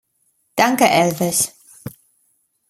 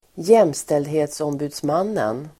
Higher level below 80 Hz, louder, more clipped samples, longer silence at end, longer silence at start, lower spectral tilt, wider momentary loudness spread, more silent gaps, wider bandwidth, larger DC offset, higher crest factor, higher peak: about the same, -60 dBFS vs -60 dBFS; first, -17 LUFS vs -20 LUFS; neither; first, 0.8 s vs 0.1 s; first, 0.55 s vs 0.15 s; second, -3.5 dB/octave vs -5.5 dB/octave; first, 22 LU vs 10 LU; neither; about the same, 16 kHz vs 16 kHz; neither; about the same, 20 dB vs 18 dB; about the same, -2 dBFS vs -2 dBFS